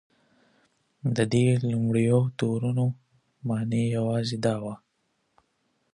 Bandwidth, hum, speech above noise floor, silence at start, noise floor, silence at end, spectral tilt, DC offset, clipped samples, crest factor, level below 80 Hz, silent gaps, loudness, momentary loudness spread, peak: 10.5 kHz; none; 49 dB; 1.05 s; -74 dBFS; 1.2 s; -7 dB/octave; under 0.1%; under 0.1%; 18 dB; -62 dBFS; none; -26 LUFS; 11 LU; -10 dBFS